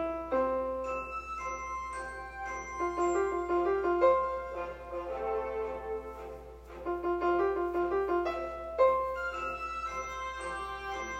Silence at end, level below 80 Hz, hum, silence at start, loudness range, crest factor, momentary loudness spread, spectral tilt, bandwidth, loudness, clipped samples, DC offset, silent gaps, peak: 0 s; -52 dBFS; none; 0 s; 3 LU; 18 dB; 12 LU; -5.5 dB/octave; 8.8 kHz; -33 LUFS; under 0.1%; under 0.1%; none; -14 dBFS